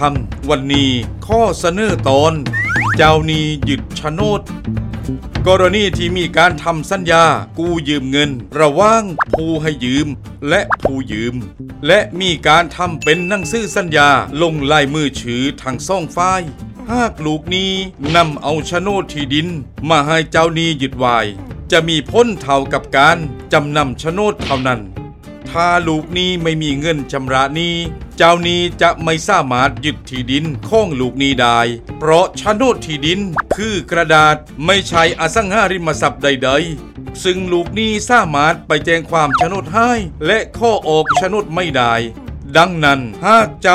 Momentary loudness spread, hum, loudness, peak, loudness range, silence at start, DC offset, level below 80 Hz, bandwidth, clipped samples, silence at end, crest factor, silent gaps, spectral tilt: 9 LU; none; -14 LUFS; 0 dBFS; 3 LU; 0 s; under 0.1%; -34 dBFS; 15 kHz; under 0.1%; 0 s; 14 dB; none; -4.5 dB/octave